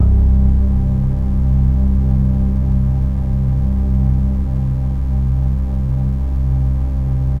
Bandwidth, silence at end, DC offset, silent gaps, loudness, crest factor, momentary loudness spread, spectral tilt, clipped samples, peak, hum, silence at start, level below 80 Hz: 2.2 kHz; 0 s; under 0.1%; none; -17 LUFS; 12 dB; 4 LU; -11 dB/octave; under 0.1%; -2 dBFS; none; 0 s; -16 dBFS